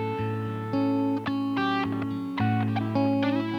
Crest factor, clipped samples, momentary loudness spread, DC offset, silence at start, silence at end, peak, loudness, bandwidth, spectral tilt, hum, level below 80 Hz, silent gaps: 14 dB; under 0.1%; 5 LU; under 0.1%; 0 s; 0 s; -12 dBFS; -27 LUFS; 6.4 kHz; -8 dB/octave; none; -62 dBFS; none